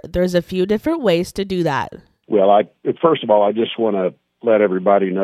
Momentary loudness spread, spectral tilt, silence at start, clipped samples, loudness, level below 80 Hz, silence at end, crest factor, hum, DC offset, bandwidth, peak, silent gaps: 8 LU; -6.5 dB/octave; 0.05 s; under 0.1%; -17 LUFS; -46 dBFS; 0 s; 16 dB; none; under 0.1%; 14.5 kHz; -2 dBFS; none